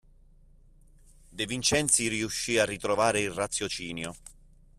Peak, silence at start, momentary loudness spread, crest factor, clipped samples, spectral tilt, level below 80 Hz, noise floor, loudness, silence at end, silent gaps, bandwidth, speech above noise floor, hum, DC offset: -10 dBFS; 1.3 s; 14 LU; 22 dB; under 0.1%; -2.5 dB/octave; -54 dBFS; -56 dBFS; -27 LUFS; 0.45 s; none; 14.5 kHz; 28 dB; none; under 0.1%